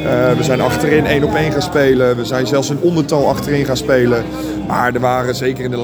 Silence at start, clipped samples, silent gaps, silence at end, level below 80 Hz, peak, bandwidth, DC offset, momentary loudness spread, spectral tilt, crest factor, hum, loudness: 0 s; under 0.1%; none; 0 s; -36 dBFS; 0 dBFS; over 20 kHz; under 0.1%; 5 LU; -6 dB/octave; 14 dB; none; -15 LUFS